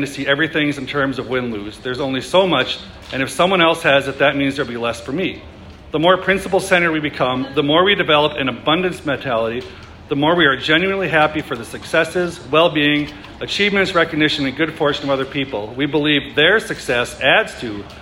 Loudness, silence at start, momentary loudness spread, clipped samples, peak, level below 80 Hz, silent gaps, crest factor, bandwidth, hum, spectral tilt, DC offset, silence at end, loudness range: -17 LUFS; 0 s; 11 LU; under 0.1%; 0 dBFS; -46 dBFS; none; 18 dB; 16 kHz; none; -4.5 dB/octave; under 0.1%; 0 s; 2 LU